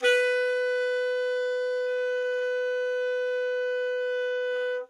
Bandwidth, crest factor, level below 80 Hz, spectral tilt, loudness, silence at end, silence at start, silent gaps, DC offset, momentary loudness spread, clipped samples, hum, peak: 10.5 kHz; 14 dB; -86 dBFS; 2 dB/octave; -27 LUFS; 0.05 s; 0 s; none; under 0.1%; 3 LU; under 0.1%; none; -12 dBFS